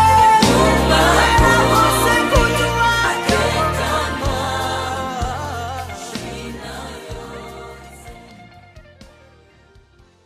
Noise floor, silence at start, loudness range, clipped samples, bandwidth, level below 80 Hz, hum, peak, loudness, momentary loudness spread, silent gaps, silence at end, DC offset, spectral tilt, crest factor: -50 dBFS; 0 s; 21 LU; under 0.1%; 15.5 kHz; -28 dBFS; none; 0 dBFS; -15 LUFS; 20 LU; none; 1.45 s; under 0.1%; -4 dB/octave; 18 dB